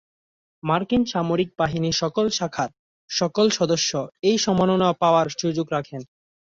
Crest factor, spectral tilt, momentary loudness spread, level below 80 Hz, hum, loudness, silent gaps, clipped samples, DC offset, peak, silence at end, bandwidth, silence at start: 18 dB; -4.5 dB/octave; 9 LU; -54 dBFS; none; -22 LUFS; 2.79-3.08 s; under 0.1%; under 0.1%; -6 dBFS; 0.45 s; 7.8 kHz; 0.65 s